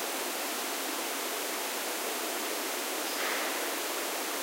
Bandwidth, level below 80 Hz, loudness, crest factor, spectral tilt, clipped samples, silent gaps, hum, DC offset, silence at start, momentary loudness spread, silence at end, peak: 16 kHz; under -90 dBFS; -32 LUFS; 16 dB; 1 dB/octave; under 0.1%; none; none; under 0.1%; 0 s; 2 LU; 0 s; -18 dBFS